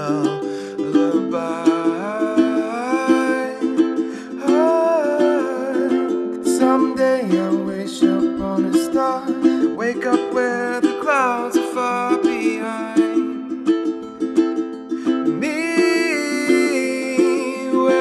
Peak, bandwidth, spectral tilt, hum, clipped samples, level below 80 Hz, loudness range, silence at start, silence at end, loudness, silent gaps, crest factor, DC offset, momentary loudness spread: -2 dBFS; 13 kHz; -5 dB/octave; none; under 0.1%; -58 dBFS; 2 LU; 0 s; 0 s; -19 LUFS; none; 16 dB; under 0.1%; 5 LU